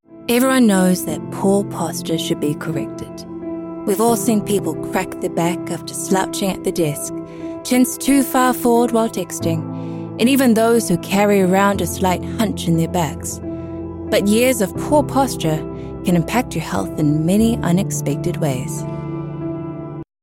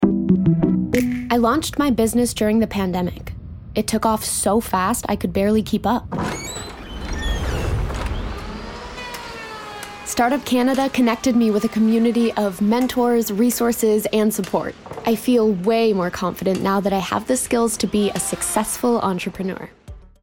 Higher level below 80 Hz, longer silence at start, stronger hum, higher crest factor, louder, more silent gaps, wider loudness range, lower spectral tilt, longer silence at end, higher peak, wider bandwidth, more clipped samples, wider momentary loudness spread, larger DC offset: second, -44 dBFS vs -36 dBFS; about the same, 0.1 s vs 0 s; neither; about the same, 14 dB vs 16 dB; about the same, -18 LUFS vs -20 LUFS; neither; second, 4 LU vs 7 LU; about the same, -5.5 dB/octave vs -5 dB/octave; about the same, 0.2 s vs 0.15 s; about the same, -4 dBFS vs -2 dBFS; about the same, 17 kHz vs 18.5 kHz; neither; about the same, 13 LU vs 13 LU; neither